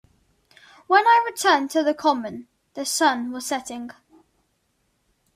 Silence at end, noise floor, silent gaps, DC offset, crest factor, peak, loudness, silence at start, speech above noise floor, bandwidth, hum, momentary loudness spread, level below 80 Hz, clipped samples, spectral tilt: 1.45 s; -70 dBFS; none; under 0.1%; 20 dB; -4 dBFS; -21 LUFS; 0.9 s; 49 dB; 16 kHz; none; 19 LU; -70 dBFS; under 0.1%; -1.5 dB/octave